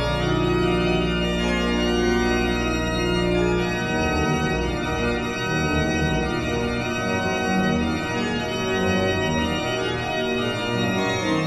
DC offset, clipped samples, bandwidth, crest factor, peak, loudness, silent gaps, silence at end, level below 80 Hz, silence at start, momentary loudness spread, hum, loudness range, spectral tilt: under 0.1%; under 0.1%; 13.5 kHz; 14 dB; -10 dBFS; -22 LUFS; none; 0 s; -34 dBFS; 0 s; 3 LU; none; 1 LU; -5.5 dB/octave